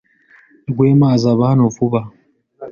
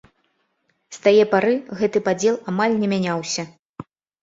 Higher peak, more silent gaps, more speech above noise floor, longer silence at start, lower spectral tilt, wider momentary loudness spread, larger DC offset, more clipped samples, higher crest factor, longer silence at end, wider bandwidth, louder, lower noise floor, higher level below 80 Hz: about the same, -2 dBFS vs -4 dBFS; second, none vs 3.59-3.74 s; second, 37 dB vs 50 dB; second, 0.7 s vs 0.9 s; first, -8.5 dB/octave vs -5 dB/octave; second, 15 LU vs 24 LU; neither; neither; about the same, 14 dB vs 18 dB; second, 0 s vs 0.4 s; second, 7 kHz vs 7.8 kHz; first, -14 LUFS vs -20 LUFS; second, -50 dBFS vs -69 dBFS; first, -50 dBFS vs -64 dBFS